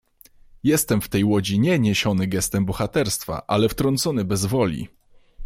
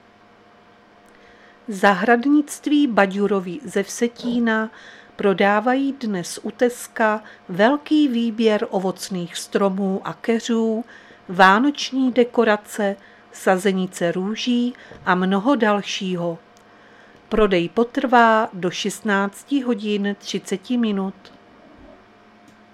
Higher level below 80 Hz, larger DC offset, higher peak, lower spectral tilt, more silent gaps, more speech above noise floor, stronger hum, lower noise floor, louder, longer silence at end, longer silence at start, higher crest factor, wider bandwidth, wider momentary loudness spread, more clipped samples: first, -46 dBFS vs -52 dBFS; neither; second, -6 dBFS vs 0 dBFS; about the same, -5 dB/octave vs -5 dB/octave; neither; about the same, 30 dB vs 31 dB; neither; about the same, -51 dBFS vs -51 dBFS; about the same, -21 LUFS vs -20 LUFS; second, 0 s vs 0.9 s; second, 0.65 s vs 1.7 s; about the same, 16 dB vs 20 dB; about the same, 16.5 kHz vs 15 kHz; second, 5 LU vs 10 LU; neither